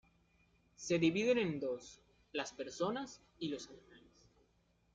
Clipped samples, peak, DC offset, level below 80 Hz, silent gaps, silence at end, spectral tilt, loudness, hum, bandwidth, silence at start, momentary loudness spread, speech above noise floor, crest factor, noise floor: under 0.1%; -20 dBFS; under 0.1%; -74 dBFS; none; 1 s; -5 dB/octave; -38 LUFS; none; 8.6 kHz; 0.8 s; 16 LU; 37 dB; 20 dB; -75 dBFS